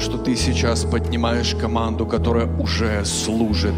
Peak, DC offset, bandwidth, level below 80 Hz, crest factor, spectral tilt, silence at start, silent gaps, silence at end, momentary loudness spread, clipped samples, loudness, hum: -8 dBFS; under 0.1%; 15 kHz; -28 dBFS; 12 dB; -5 dB/octave; 0 s; none; 0 s; 2 LU; under 0.1%; -20 LUFS; none